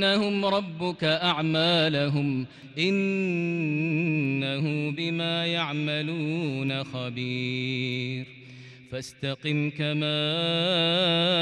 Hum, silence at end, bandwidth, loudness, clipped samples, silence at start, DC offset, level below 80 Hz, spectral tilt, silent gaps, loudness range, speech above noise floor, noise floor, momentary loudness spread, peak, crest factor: none; 0 s; 11 kHz; -26 LUFS; under 0.1%; 0 s; under 0.1%; -68 dBFS; -6 dB/octave; none; 5 LU; 20 dB; -46 dBFS; 11 LU; -12 dBFS; 16 dB